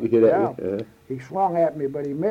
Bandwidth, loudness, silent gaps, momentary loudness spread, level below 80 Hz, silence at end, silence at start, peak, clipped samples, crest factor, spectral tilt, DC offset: 7.2 kHz; -23 LUFS; none; 14 LU; -62 dBFS; 0 s; 0 s; -8 dBFS; under 0.1%; 14 dB; -9 dB/octave; under 0.1%